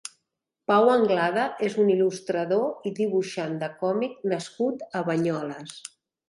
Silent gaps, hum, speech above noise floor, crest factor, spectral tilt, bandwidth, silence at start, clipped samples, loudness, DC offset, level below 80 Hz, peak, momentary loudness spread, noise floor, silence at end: none; none; 57 dB; 18 dB; -5.5 dB/octave; 11.5 kHz; 0.05 s; under 0.1%; -25 LUFS; under 0.1%; -74 dBFS; -8 dBFS; 15 LU; -81 dBFS; 0.45 s